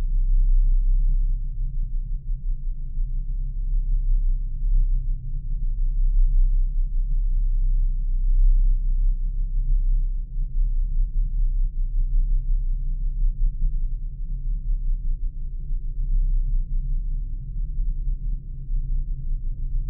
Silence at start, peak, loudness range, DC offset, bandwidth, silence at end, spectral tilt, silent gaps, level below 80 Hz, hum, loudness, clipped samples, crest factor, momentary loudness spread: 0 s; -10 dBFS; 4 LU; under 0.1%; 0.4 kHz; 0 s; -14.5 dB/octave; none; -20 dBFS; none; -29 LUFS; under 0.1%; 10 dB; 9 LU